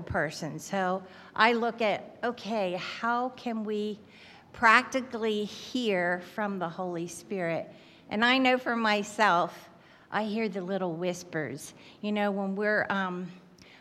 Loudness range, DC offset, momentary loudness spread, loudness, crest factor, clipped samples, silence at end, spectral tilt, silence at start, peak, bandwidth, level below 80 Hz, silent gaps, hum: 4 LU; under 0.1%; 13 LU; -29 LUFS; 24 dB; under 0.1%; 0.4 s; -4.5 dB/octave; 0 s; -6 dBFS; 14 kHz; -66 dBFS; none; none